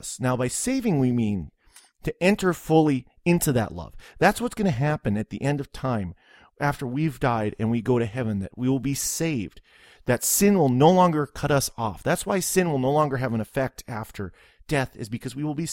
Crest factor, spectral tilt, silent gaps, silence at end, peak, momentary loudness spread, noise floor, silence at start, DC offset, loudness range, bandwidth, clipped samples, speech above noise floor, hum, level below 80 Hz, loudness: 20 dB; -5.5 dB/octave; none; 0 s; -4 dBFS; 14 LU; -55 dBFS; 0.05 s; under 0.1%; 5 LU; 16.5 kHz; under 0.1%; 31 dB; none; -48 dBFS; -24 LUFS